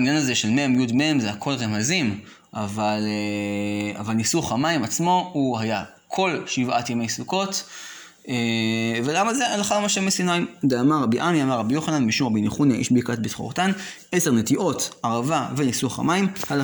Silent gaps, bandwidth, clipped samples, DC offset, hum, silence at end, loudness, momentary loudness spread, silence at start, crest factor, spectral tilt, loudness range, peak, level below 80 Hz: none; over 20 kHz; under 0.1%; under 0.1%; none; 0 s; -22 LUFS; 7 LU; 0 s; 14 dB; -4.5 dB/octave; 3 LU; -8 dBFS; -60 dBFS